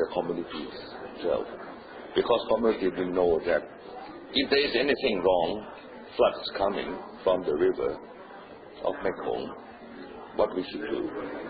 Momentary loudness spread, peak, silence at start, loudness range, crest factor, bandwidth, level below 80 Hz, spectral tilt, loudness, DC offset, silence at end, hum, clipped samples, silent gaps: 18 LU; -10 dBFS; 0 s; 6 LU; 18 dB; 5 kHz; -56 dBFS; -9 dB/octave; -28 LUFS; under 0.1%; 0 s; none; under 0.1%; none